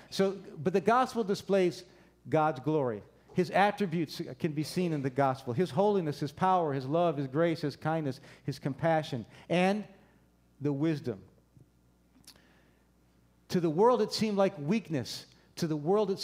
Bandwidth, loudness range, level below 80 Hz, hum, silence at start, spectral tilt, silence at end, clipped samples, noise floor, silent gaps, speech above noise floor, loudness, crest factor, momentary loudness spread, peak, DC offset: 16 kHz; 5 LU; -70 dBFS; none; 0.1 s; -6.5 dB/octave; 0 s; under 0.1%; -66 dBFS; none; 36 dB; -31 LUFS; 20 dB; 10 LU; -12 dBFS; under 0.1%